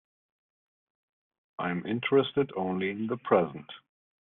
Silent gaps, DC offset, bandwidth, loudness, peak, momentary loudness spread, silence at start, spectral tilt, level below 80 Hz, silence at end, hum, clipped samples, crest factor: none; under 0.1%; 4 kHz; -29 LUFS; -10 dBFS; 20 LU; 1.6 s; -4.5 dB/octave; -72 dBFS; 0.55 s; none; under 0.1%; 22 dB